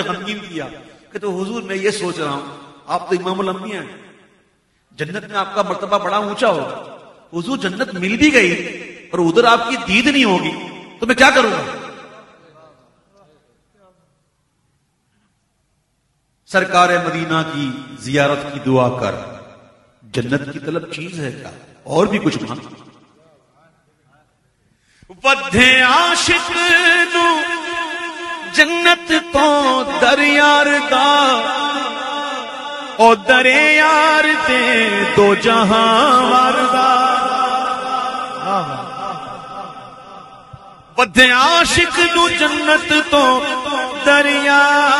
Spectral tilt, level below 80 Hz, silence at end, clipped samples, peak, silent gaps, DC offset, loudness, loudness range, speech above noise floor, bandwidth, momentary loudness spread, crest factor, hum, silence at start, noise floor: -3.5 dB/octave; -48 dBFS; 0 s; under 0.1%; 0 dBFS; none; under 0.1%; -14 LUFS; 11 LU; 51 dB; 16 kHz; 17 LU; 16 dB; none; 0 s; -65 dBFS